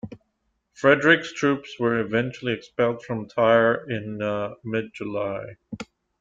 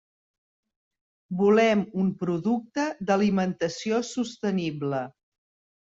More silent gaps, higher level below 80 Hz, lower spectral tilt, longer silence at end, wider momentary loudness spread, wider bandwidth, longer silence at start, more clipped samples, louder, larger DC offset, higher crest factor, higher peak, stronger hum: neither; first, -62 dBFS vs -68 dBFS; about the same, -6 dB/octave vs -6 dB/octave; second, 0.35 s vs 0.75 s; first, 19 LU vs 10 LU; about the same, 7.8 kHz vs 7.8 kHz; second, 0.05 s vs 1.3 s; neither; first, -23 LUFS vs -26 LUFS; neither; about the same, 22 dB vs 18 dB; first, -4 dBFS vs -10 dBFS; neither